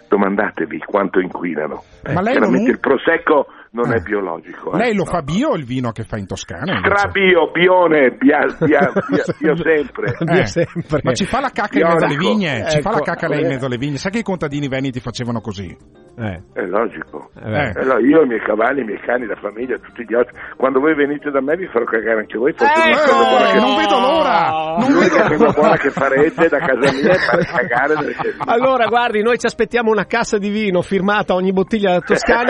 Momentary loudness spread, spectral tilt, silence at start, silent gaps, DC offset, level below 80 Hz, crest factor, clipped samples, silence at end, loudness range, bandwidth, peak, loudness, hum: 11 LU; -6 dB/octave; 0.1 s; none; under 0.1%; -46 dBFS; 16 dB; under 0.1%; 0 s; 6 LU; 11 kHz; 0 dBFS; -16 LUFS; none